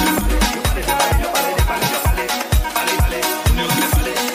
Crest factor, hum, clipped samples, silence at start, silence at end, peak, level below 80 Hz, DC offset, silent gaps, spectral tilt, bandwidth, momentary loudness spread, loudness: 14 dB; none; under 0.1%; 0 s; 0 s; -2 dBFS; -22 dBFS; under 0.1%; none; -3.5 dB/octave; 15.5 kHz; 2 LU; -18 LUFS